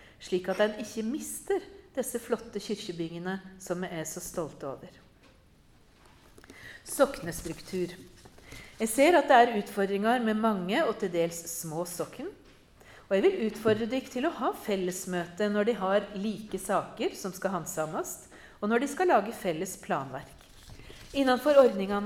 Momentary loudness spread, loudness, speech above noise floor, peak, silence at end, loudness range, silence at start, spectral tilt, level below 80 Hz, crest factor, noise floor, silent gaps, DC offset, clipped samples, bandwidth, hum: 16 LU; -29 LUFS; 31 dB; -6 dBFS; 0 s; 10 LU; 0.2 s; -4.5 dB/octave; -60 dBFS; 22 dB; -59 dBFS; none; under 0.1%; under 0.1%; 17.5 kHz; none